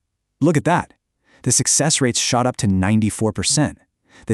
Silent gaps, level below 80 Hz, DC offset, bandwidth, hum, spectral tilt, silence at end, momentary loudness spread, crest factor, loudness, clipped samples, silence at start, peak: none; -48 dBFS; under 0.1%; 13.5 kHz; none; -4 dB/octave; 0 s; 6 LU; 18 dB; -18 LUFS; under 0.1%; 0.4 s; -2 dBFS